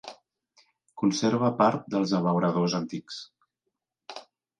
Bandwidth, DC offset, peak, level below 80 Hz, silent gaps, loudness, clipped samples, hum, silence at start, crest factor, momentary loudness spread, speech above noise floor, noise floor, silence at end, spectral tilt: 9.8 kHz; under 0.1%; -10 dBFS; -72 dBFS; none; -26 LUFS; under 0.1%; none; 0.05 s; 20 dB; 20 LU; 58 dB; -83 dBFS; 0.4 s; -6 dB/octave